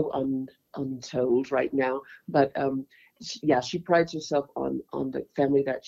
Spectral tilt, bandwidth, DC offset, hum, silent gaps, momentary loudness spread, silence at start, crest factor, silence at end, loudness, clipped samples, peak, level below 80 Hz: -6 dB/octave; 7.6 kHz; under 0.1%; none; none; 11 LU; 0 s; 18 dB; 0 s; -27 LUFS; under 0.1%; -8 dBFS; -64 dBFS